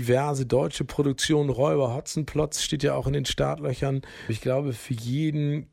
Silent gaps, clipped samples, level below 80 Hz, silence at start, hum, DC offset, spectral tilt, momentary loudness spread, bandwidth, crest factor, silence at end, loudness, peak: none; under 0.1%; -46 dBFS; 0 s; none; under 0.1%; -5.5 dB/octave; 7 LU; 15.5 kHz; 16 dB; 0.1 s; -26 LUFS; -10 dBFS